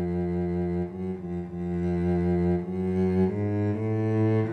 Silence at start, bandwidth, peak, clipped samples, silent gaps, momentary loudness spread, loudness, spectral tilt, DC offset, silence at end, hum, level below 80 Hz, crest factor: 0 s; 4.5 kHz; -14 dBFS; under 0.1%; none; 8 LU; -27 LUFS; -10.5 dB/octave; under 0.1%; 0 s; none; -48 dBFS; 12 dB